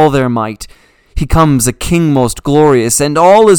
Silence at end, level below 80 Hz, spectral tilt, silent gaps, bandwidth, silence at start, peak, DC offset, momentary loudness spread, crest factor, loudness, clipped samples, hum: 0 s; -26 dBFS; -5.5 dB/octave; none; 19.5 kHz; 0 s; 0 dBFS; under 0.1%; 13 LU; 10 dB; -10 LUFS; 1%; none